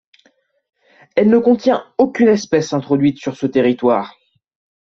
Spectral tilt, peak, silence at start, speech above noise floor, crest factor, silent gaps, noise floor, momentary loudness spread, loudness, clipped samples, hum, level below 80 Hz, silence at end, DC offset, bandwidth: -6.5 dB/octave; -2 dBFS; 1.15 s; 44 dB; 14 dB; none; -59 dBFS; 7 LU; -16 LUFS; under 0.1%; none; -58 dBFS; 0.75 s; under 0.1%; 7.4 kHz